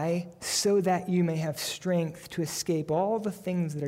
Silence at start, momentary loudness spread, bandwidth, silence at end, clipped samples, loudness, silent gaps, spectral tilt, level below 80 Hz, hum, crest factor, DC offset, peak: 0 s; 7 LU; 16 kHz; 0 s; under 0.1%; -29 LUFS; none; -5 dB/octave; -66 dBFS; none; 12 dB; under 0.1%; -16 dBFS